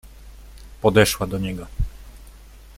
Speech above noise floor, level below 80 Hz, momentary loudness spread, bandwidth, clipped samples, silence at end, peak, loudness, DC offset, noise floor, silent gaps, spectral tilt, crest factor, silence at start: 24 dB; -36 dBFS; 15 LU; 16.5 kHz; under 0.1%; 0.2 s; -2 dBFS; -21 LUFS; under 0.1%; -44 dBFS; none; -4.5 dB/octave; 22 dB; 0.15 s